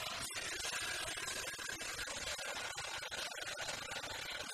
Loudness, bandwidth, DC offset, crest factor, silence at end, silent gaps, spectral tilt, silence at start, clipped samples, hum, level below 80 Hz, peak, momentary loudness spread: -41 LUFS; 15.5 kHz; under 0.1%; 16 dB; 0 s; none; -0.5 dB/octave; 0 s; under 0.1%; none; -64 dBFS; -28 dBFS; 3 LU